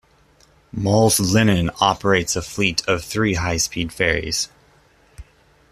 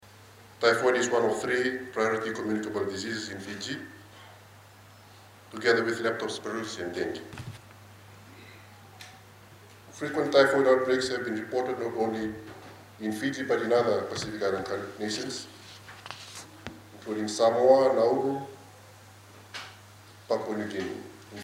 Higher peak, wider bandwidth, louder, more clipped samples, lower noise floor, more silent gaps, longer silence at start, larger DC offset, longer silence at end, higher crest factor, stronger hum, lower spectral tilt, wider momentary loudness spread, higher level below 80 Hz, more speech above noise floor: first, -2 dBFS vs -6 dBFS; second, 14.5 kHz vs 16 kHz; first, -19 LUFS vs -28 LUFS; neither; about the same, -55 dBFS vs -52 dBFS; neither; first, 0.75 s vs 0.2 s; neither; first, 0.5 s vs 0 s; about the same, 20 dB vs 24 dB; neither; about the same, -4 dB/octave vs -4 dB/octave; second, 8 LU vs 23 LU; first, -42 dBFS vs -68 dBFS; first, 36 dB vs 25 dB